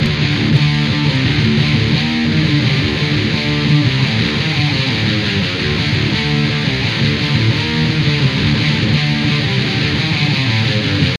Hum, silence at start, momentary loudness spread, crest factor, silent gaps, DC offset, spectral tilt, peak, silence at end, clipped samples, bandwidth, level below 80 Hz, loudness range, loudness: none; 0 s; 2 LU; 14 dB; none; under 0.1%; -6 dB/octave; 0 dBFS; 0 s; under 0.1%; 10.5 kHz; -34 dBFS; 1 LU; -14 LUFS